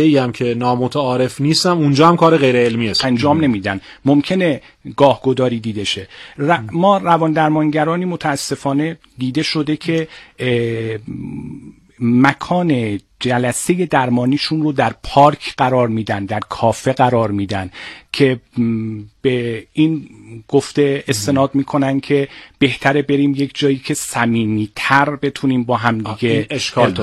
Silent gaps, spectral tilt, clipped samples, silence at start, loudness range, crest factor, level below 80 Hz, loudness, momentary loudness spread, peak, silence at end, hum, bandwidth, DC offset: none; -5.5 dB/octave; under 0.1%; 0 s; 5 LU; 16 dB; -50 dBFS; -16 LUFS; 10 LU; 0 dBFS; 0 s; none; 13.5 kHz; under 0.1%